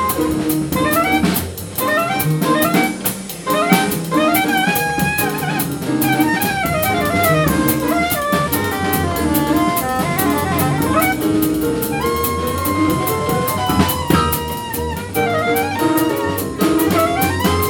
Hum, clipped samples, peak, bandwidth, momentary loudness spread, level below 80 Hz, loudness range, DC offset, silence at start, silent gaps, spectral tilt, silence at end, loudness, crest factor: none; under 0.1%; 0 dBFS; 19.5 kHz; 5 LU; -36 dBFS; 1 LU; under 0.1%; 0 s; none; -4.5 dB/octave; 0 s; -17 LUFS; 16 dB